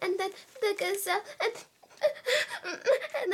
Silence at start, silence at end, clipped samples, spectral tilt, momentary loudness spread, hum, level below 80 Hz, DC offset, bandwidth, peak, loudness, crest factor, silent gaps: 0 s; 0 s; under 0.1%; -1 dB/octave; 5 LU; none; -86 dBFS; under 0.1%; 17 kHz; -14 dBFS; -31 LUFS; 16 dB; none